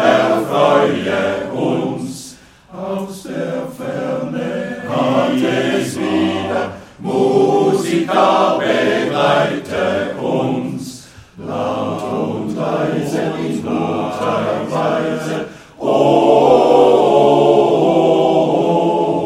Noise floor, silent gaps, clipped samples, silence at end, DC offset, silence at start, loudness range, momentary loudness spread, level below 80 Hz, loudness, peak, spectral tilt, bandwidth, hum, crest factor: -39 dBFS; none; under 0.1%; 0 s; under 0.1%; 0 s; 9 LU; 13 LU; -54 dBFS; -16 LUFS; 0 dBFS; -6 dB/octave; 15.5 kHz; none; 14 dB